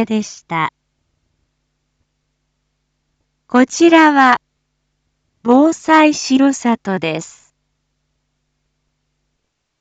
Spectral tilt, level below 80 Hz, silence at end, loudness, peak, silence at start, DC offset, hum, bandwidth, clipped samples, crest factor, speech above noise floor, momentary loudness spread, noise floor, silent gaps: -4 dB/octave; -64 dBFS; 2.55 s; -13 LUFS; 0 dBFS; 0 s; under 0.1%; none; 9 kHz; under 0.1%; 16 dB; 59 dB; 14 LU; -72 dBFS; none